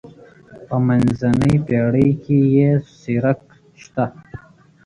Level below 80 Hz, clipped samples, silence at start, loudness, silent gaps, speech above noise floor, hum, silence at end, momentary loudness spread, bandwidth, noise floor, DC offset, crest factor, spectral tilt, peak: -44 dBFS; under 0.1%; 0.5 s; -18 LUFS; none; 27 dB; none; 0.5 s; 10 LU; 11 kHz; -43 dBFS; under 0.1%; 16 dB; -9 dB/octave; -4 dBFS